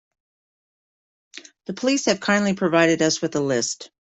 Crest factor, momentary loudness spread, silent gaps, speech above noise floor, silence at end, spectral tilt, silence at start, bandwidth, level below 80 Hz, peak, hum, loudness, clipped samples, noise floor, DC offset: 20 dB; 9 LU; none; over 69 dB; 0.2 s; -4 dB/octave; 1.35 s; 8.2 kHz; -64 dBFS; -4 dBFS; none; -21 LUFS; under 0.1%; under -90 dBFS; under 0.1%